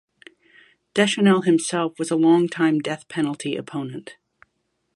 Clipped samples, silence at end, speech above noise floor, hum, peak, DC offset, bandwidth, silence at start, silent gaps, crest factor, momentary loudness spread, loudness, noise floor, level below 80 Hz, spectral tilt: under 0.1%; 0.85 s; 53 dB; none; -4 dBFS; under 0.1%; 11.5 kHz; 0.95 s; none; 18 dB; 13 LU; -21 LUFS; -73 dBFS; -68 dBFS; -5 dB/octave